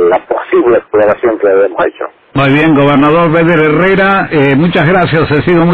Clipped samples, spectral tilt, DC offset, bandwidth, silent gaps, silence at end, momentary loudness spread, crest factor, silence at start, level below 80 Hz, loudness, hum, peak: under 0.1%; -9 dB/octave; under 0.1%; 4.9 kHz; none; 0 s; 5 LU; 8 dB; 0 s; -36 dBFS; -9 LUFS; none; -2 dBFS